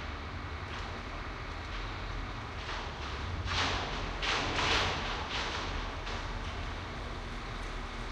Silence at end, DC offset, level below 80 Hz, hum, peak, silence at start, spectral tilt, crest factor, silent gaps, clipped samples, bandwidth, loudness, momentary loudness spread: 0 s; under 0.1%; -42 dBFS; none; -18 dBFS; 0 s; -3.5 dB/octave; 18 dB; none; under 0.1%; 10.5 kHz; -36 LUFS; 11 LU